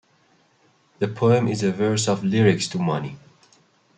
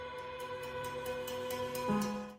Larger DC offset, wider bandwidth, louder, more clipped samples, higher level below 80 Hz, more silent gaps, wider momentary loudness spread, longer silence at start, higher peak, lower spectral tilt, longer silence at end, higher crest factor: neither; second, 9.4 kHz vs 16 kHz; first, -21 LUFS vs -39 LUFS; neither; about the same, -62 dBFS vs -62 dBFS; neither; about the same, 10 LU vs 8 LU; first, 1 s vs 0 s; first, -4 dBFS vs -22 dBFS; about the same, -5.5 dB/octave vs -4.5 dB/octave; first, 0.8 s vs 0 s; about the same, 18 dB vs 16 dB